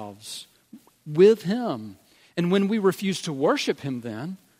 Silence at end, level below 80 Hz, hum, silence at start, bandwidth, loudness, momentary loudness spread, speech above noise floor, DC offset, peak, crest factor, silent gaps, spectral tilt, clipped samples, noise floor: 0.25 s; -72 dBFS; none; 0 s; 16 kHz; -24 LUFS; 19 LU; 28 dB; under 0.1%; -6 dBFS; 18 dB; none; -6 dB/octave; under 0.1%; -51 dBFS